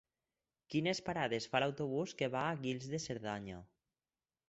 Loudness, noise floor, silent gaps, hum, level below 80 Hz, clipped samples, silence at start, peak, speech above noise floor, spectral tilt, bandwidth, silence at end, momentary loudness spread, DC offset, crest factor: -38 LUFS; under -90 dBFS; none; none; -70 dBFS; under 0.1%; 0.7 s; -18 dBFS; over 52 dB; -5 dB/octave; 8.2 kHz; 0.85 s; 8 LU; under 0.1%; 22 dB